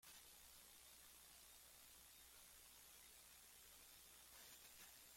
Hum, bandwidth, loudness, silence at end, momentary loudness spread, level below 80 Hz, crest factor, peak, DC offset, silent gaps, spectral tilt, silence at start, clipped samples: none; 16.5 kHz; -63 LUFS; 0 s; 2 LU; -82 dBFS; 16 dB; -50 dBFS; under 0.1%; none; 0 dB/octave; 0 s; under 0.1%